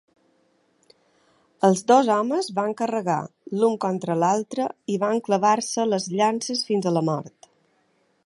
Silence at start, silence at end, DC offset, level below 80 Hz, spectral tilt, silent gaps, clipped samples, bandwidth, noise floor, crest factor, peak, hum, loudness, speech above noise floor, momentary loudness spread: 1.6 s; 1 s; under 0.1%; -76 dBFS; -5 dB/octave; none; under 0.1%; 11.5 kHz; -66 dBFS; 20 dB; -4 dBFS; none; -23 LUFS; 44 dB; 9 LU